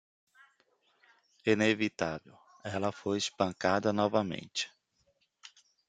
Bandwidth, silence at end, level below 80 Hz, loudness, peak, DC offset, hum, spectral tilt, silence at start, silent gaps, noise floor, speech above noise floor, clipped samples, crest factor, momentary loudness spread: 9.4 kHz; 0.4 s; -72 dBFS; -32 LUFS; -12 dBFS; under 0.1%; none; -4.5 dB/octave; 1.45 s; none; -74 dBFS; 43 dB; under 0.1%; 22 dB; 10 LU